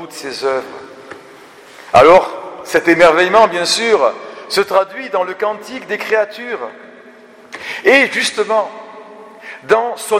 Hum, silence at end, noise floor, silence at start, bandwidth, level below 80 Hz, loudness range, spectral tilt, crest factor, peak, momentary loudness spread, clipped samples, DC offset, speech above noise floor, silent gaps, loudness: none; 0 s; -41 dBFS; 0 s; 16 kHz; -52 dBFS; 7 LU; -3 dB/octave; 16 dB; 0 dBFS; 23 LU; under 0.1%; under 0.1%; 27 dB; none; -13 LUFS